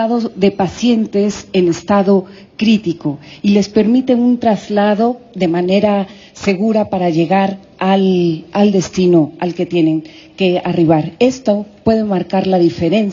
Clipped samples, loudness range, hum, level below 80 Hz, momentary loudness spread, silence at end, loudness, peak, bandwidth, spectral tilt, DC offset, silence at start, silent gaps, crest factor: under 0.1%; 1 LU; none; -52 dBFS; 6 LU; 0 s; -14 LUFS; 0 dBFS; 7.6 kHz; -6.5 dB/octave; under 0.1%; 0 s; none; 14 dB